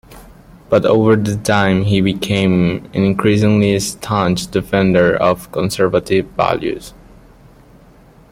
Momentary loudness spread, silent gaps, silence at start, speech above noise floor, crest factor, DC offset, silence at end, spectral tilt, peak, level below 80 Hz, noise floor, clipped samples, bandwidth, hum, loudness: 6 LU; none; 0.1 s; 30 dB; 14 dB; under 0.1%; 1.4 s; -6 dB/octave; 0 dBFS; -42 dBFS; -44 dBFS; under 0.1%; 16 kHz; none; -15 LUFS